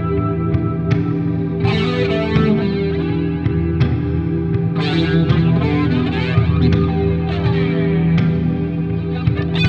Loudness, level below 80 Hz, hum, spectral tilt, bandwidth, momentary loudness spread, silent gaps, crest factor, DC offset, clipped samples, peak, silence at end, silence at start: -17 LUFS; -30 dBFS; none; -9 dB/octave; 5.8 kHz; 4 LU; none; 14 dB; under 0.1%; under 0.1%; -2 dBFS; 0 s; 0 s